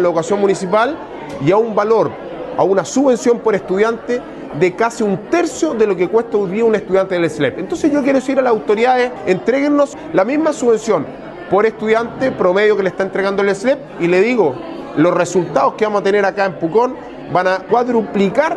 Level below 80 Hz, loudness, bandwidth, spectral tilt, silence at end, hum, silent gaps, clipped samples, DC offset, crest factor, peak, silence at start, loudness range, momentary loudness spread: -52 dBFS; -15 LUFS; 11.5 kHz; -5.5 dB/octave; 0 s; none; none; under 0.1%; under 0.1%; 14 dB; 0 dBFS; 0 s; 1 LU; 6 LU